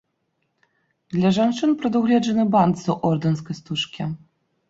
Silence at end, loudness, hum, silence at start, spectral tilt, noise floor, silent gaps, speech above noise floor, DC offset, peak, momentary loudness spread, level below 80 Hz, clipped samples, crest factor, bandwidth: 0.55 s; -21 LUFS; none; 1.1 s; -6.5 dB/octave; -73 dBFS; none; 52 dB; under 0.1%; -4 dBFS; 10 LU; -60 dBFS; under 0.1%; 18 dB; 7.8 kHz